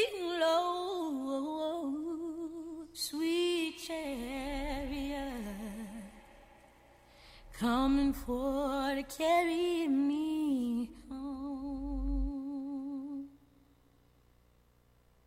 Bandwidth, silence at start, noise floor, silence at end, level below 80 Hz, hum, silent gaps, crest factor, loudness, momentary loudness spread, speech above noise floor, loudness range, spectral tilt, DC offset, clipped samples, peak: 16 kHz; 0 s; -67 dBFS; 1.9 s; -48 dBFS; 60 Hz at -60 dBFS; none; 18 dB; -35 LUFS; 13 LU; 36 dB; 9 LU; -4.5 dB/octave; under 0.1%; under 0.1%; -18 dBFS